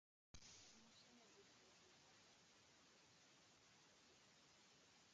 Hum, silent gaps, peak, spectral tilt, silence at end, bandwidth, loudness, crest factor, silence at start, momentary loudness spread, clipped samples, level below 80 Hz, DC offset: none; none; -48 dBFS; -2 dB/octave; 0 s; 8.8 kHz; -67 LUFS; 22 dB; 0.35 s; 6 LU; under 0.1%; -84 dBFS; under 0.1%